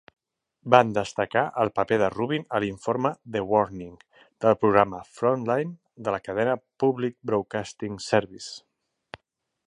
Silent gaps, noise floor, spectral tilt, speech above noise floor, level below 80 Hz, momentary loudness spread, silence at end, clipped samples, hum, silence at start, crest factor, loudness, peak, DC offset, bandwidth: none; -77 dBFS; -6 dB/octave; 52 dB; -60 dBFS; 14 LU; 1.1 s; under 0.1%; none; 0.65 s; 24 dB; -25 LUFS; 0 dBFS; under 0.1%; 11 kHz